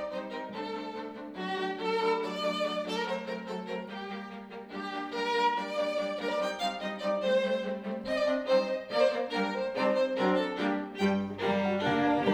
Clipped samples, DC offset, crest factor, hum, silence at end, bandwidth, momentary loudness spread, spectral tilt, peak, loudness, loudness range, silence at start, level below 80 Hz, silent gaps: under 0.1%; under 0.1%; 18 dB; none; 0 s; 13.5 kHz; 11 LU; -5.5 dB/octave; -14 dBFS; -31 LUFS; 4 LU; 0 s; -70 dBFS; none